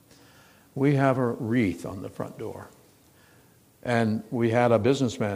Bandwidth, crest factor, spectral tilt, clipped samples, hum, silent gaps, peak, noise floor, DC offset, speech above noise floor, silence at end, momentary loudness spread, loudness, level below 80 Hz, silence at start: 15.5 kHz; 20 dB; -7 dB/octave; under 0.1%; none; none; -6 dBFS; -58 dBFS; under 0.1%; 33 dB; 0 s; 16 LU; -25 LUFS; -62 dBFS; 0.75 s